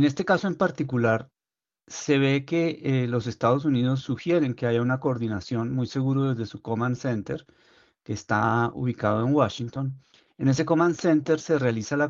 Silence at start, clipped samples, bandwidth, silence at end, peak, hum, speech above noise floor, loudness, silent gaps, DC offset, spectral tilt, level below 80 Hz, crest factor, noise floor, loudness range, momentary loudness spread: 0 s; under 0.1%; 7.4 kHz; 0 s; -8 dBFS; none; over 66 dB; -25 LUFS; none; under 0.1%; -6.5 dB/octave; -62 dBFS; 18 dB; under -90 dBFS; 3 LU; 9 LU